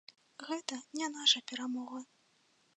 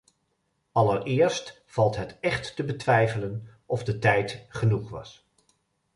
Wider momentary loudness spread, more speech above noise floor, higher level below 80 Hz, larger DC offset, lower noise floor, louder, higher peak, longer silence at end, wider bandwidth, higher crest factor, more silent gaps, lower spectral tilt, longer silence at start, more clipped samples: first, 20 LU vs 11 LU; second, 35 dB vs 49 dB; second, under -90 dBFS vs -54 dBFS; neither; about the same, -72 dBFS vs -74 dBFS; second, -34 LUFS vs -26 LUFS; second, -14 dBFS vs -6 dBFS; about the same, 0.75 s vs 0.85 s; about the same, 10 kHz vs 11 kHz; about the same, 24 dB vs 20 dB; neither; second, 0.5 dB/octave vs -6 dB/octave; second, 0.4 s vs 0.75 s; neither